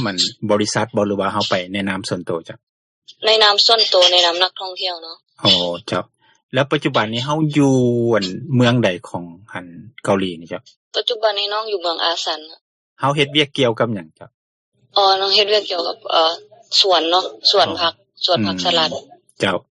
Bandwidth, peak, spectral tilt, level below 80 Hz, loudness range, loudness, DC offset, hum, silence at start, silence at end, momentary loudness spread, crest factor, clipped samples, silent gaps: 11.5 kHz; 0 dBFS; -4 dB/octave; -62 dBFS; 6 LU; -17 LUFS; under 0.1%; none; 0 s; 0.1 s; 15 LU; 18 dB; under 0.1%; 2.63-3.02 s, 6.43-6.49 s, 10.76-10.91 s, 12.61-12.96 s, 14.34-14.72 s